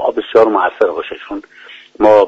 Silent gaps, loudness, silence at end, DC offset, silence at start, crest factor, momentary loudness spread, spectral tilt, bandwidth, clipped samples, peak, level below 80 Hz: none; -13 LUFS; 0 s; under 0.1%; 0 s; 14 dB; 17 LU; -6 dB/octave; 7.4 kHz; under 0.1%; 0 dBFS; -52 dBFS